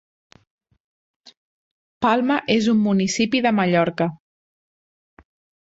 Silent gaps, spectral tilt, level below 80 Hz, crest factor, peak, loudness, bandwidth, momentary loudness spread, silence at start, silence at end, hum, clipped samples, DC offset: none; -5 dB/octave; -60 dBFS; 18 dB; -6 dBFS; -20 LUFS; 8 kHz; 5 LU; 2 s; 1.5 s; none; under 0.1%; under 0.1%